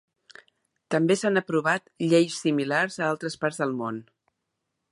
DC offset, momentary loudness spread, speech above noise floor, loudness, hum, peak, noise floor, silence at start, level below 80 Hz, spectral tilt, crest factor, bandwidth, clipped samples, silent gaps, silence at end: under 0.1%; 7 LU; 56 dB; -25 LUFS; none; -8 dBFS; -81 dBFS; 0.9 s; -76 dBFS; -5 dB/octave; 18 dB; 11.5 kHz; under 0.1%; none; 0.9 s